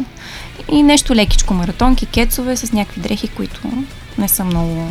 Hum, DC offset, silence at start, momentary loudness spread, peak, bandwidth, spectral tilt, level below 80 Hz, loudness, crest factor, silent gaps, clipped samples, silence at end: none; under 0.1%; 0 s; 15 LU; 0 dBFS; 15.5 kHz; -4 dB/octave; -22 dBFS; -16 LUFS; 14 dB; none; under 0.1%; 0 s